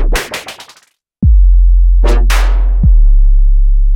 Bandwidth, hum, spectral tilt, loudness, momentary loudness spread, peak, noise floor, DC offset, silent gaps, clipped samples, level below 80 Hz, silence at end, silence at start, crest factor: 11 kHz; none; -5.5 dB/octave; -12 LUFS; 11 LU; 0 dBFS; -50 dBFS; under 0.1%; none; under 0.1%; -8 dBFS; 0 s; 0 s; 6 dB